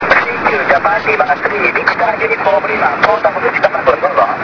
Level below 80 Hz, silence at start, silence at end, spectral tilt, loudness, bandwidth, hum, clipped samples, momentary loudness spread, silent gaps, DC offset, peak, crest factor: -46 dBFS; 0 s; 0 s; -5.5 dB/octave; -12 LUFS; 5.4 kHz; none; 0.3%; 2 LU; none; under 0.1%; 0 dBFS; 12 dB